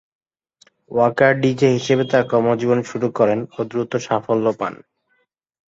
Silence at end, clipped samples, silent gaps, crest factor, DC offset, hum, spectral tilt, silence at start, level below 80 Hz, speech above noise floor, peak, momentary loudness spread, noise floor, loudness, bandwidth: 0.9 s; under 0.1%; none; 18 dB; under 0.1%; none; -6.5 dB/octave; 0.9 s; -60 dBFS; 49 dB; -2 dBFS; 9 LU; -67 dBFS; -19 LUFS; 8 kHz